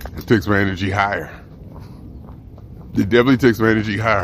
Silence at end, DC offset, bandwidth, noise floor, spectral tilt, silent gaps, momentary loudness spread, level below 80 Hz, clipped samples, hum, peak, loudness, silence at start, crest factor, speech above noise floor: 0 s; under 0.1%; 15.5 kHz; -37 dBFS; -7 dB/octave; none; 24 LU; -40 dBFS; under 0.1%; none; 0 dBFS; -17 LUFS; 0 s; 18 dB; 21 dB